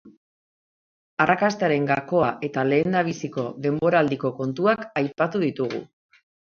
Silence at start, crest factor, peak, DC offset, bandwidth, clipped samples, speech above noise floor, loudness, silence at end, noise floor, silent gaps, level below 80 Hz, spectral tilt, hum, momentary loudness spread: 0.05 s; 20 dB; -4 dBFS; under 0.1%; 7.2 kHz; under 0.1%; over 67 dB; -23 LUFS; 0.7 s; under -90 dBFS; 0.17-1.17 s; -64 dBFS; -6.5 dB/octave; none; 9 LU